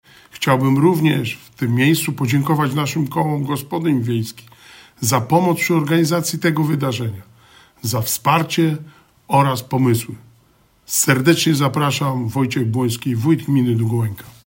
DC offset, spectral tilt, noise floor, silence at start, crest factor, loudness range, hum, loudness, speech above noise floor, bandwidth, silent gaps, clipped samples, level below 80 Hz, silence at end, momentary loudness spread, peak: under 0.1%; -5 dB/octave; -55 dBFS; 0.35 s; 18 dB; 2 LU; none; -18 LUFS; 38 dB; 16.5 kHz; none; under 0.1%; -58 dBFS; 0.15 s; 8 LU; 0 dBFS